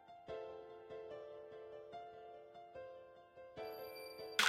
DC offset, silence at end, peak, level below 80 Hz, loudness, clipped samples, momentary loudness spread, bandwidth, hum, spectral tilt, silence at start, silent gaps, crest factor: under 0.1%; 0 s; -20 dBFS; -80 dBFS; -52 LUFS; under 0.1%; 7 LU; 14.5 kHz; none; -0.5 dB/octave; 0 s; none; 28 dB